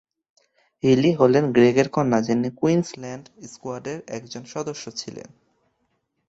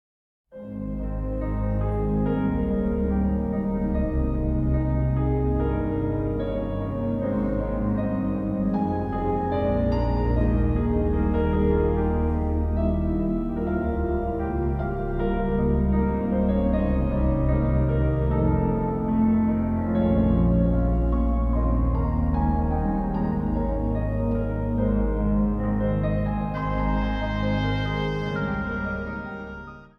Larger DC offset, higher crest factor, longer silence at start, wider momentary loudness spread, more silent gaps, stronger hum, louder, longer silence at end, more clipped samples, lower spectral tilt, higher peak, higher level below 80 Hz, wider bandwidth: neither; first, 20 dB vs 14 dB; first, 0.85 s vs 0.55 s; first, 19 LU vs 5 LU; neither; neither; first, -21 LUFS vs -25 LUFS; first, 1.1 s vs 0.15 s; neither; second, -6 dB/octave vs -10.5 dB/octave; first, -2 dBFS vs -8 dBFS; second, -60 dBFS vs -28 dBFS; first, 8 kHz vs 5.6 kHz